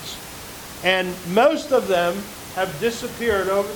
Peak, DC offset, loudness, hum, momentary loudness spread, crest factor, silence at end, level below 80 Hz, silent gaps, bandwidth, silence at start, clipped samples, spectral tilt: -2 dBFS; under 0.1%; -21 LUFS; none; 15 LU; 20 dB; 0 s; -48 dBFS; none; over 20 kHz; 0 s; under 0.1%; -4 dB/octave